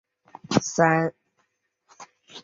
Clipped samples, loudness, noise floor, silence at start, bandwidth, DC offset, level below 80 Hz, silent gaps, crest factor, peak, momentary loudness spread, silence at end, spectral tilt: under 0.1%; -23 LUFS; -72 dBFS; 0.5 s; 7.8 kHz; under 0.1%; -64 dBFS; none; 22 dB; -4 dBFS; 11 LU; 0.05 s; -5 dB/octave